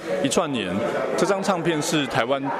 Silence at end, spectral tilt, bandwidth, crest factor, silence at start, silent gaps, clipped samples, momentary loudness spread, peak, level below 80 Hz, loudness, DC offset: 0 s; -4 dB/octave; 15.5 kHz; 18 dB; 0 s; none; under 0.1%; 3 LU; -6 dBFS; -58 dBFS; -23 LUFS; under 0.1%